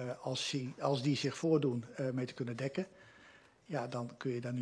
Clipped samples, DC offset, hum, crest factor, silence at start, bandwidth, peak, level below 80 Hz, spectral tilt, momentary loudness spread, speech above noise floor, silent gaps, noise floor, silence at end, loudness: under 0.1%; under 0.1%; none; 20 dB; 0 s; 11 kHz; -18 dBFS; -78 dBFS; -5.5 dB/octave; 9 LU; 25 dB; none; -62 dBFS; 0 s; -37 LUFS